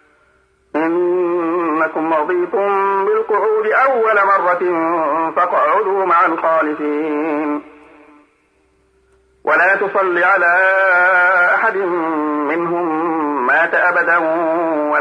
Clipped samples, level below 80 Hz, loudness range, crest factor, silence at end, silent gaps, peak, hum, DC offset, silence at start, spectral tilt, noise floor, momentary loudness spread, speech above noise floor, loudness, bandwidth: under 0.1%; -66 dBFS; 5 LU; 12 dB; 0 s; none; -4 dBFS; none; under 0.1%; 0.75 s; -6.5 dB/octave; -58 dBFS; 7 LU; 43 dB; -15 LUFS; 9.8 kHz